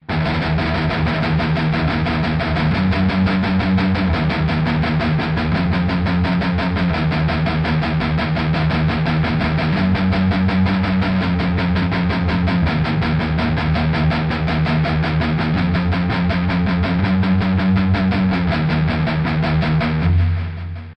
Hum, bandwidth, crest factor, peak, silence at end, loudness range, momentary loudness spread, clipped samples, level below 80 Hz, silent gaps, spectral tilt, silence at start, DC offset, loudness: none; 6 kHz; 12 dB; -6 dBFS; 0 s; 1 LU; 2 LU; under 0.1%; -30 dBFS; none; -8.5 dB/octave; 0.1 s; under 0.1%; -18 LUFS